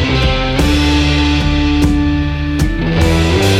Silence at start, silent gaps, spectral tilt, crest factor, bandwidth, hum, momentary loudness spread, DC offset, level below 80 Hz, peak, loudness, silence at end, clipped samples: 0 s; none; -5.5 dB/octave; 10 dB; 15.5 kHz; none; 4 LU; under 0.1%; -18 dBFS; -2 dBFS; -13 LUFS; 0 s; under 0.1%